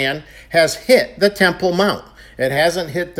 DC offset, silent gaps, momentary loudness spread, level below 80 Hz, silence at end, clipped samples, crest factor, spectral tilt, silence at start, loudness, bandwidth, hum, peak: under 0.1%; none; 9 LU; -46 dBFS; 0 s; under 0.1%; 16 dB; -4 dB/octave; 0 s; -16 LUFS; 17 kHz; none; 0 dBFS